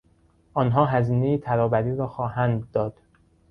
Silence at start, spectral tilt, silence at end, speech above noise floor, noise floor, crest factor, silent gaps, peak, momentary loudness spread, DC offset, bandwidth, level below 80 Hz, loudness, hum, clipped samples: 0.55 s; -10.5 dB/octave; 0.6 s; 38 dB; -60 dBFS; 18 dB; none; -6 dBFS; 7 LU; under 0.1%; 4.8 kHz; -52 dBFS; -24 LUFS; none; under 0.1%